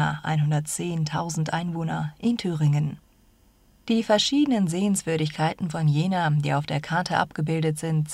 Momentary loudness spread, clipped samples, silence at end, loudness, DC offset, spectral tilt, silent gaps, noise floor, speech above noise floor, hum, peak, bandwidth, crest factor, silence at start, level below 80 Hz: 6 LU; under 0.1%; 0 s; -25 LUFS; under 0.1%; -5.5 dB/octave; none; -58 dBFS; 34 dB; none; -8 dBFS; 13 kHz; 18 dB; 0 s; -58 dBFS